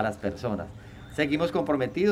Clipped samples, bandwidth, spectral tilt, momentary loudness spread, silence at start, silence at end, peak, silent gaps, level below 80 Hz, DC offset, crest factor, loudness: under 0.1%; 14 kHz; -6.5 dB/octave; 13 LU; 0 s; 0 s; -10 dBFS; none; -54 dBFS; under 0.1%; 18 dB; -28 LUFS